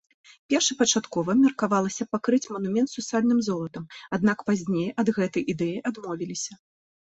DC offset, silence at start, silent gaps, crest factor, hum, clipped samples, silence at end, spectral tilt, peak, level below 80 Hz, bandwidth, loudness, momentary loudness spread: under 0.1%; 0.5 s; none; 18 dB; none; under 0.1%; 0.5 s; -4 dB/octave; -8 dBFS; -66 dBFS; 8.2 kHz; -25 LUFS; 11 LU